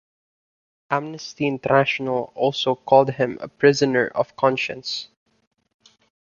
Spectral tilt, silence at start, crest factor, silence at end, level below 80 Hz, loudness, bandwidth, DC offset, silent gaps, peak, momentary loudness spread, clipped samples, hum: -5 dB/octave; 0.9 s; 20 dB; 1.25 s; -62 dBFS; -21 LUFS; 7.4 kHz; under 0.1%; none; -2 dBFS; 10 LU; under 0.1%; none